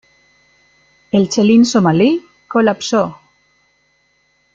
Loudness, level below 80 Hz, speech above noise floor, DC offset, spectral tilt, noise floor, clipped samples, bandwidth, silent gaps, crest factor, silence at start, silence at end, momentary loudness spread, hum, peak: -14 LUFS; -56 dBFS; 47 dB; under 0.1%; -5.5 dB/octave; -60 dBFS; under 0.1%; 7.8 kHz; none; 14 dB; 1.15 s; 1.4 s; 9 LU; none; -2 dBFS